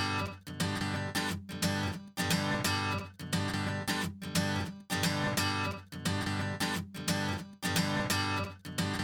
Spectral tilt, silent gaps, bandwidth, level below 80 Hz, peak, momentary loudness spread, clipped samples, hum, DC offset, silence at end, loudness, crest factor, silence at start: -4 dB/octave; none; over 20 kHz; -58 dBFS; -14 dBFS; 6 LU; under 0.1%; none; under 0.1%; 0 s; -33 LUFS; 18 dB; 0 s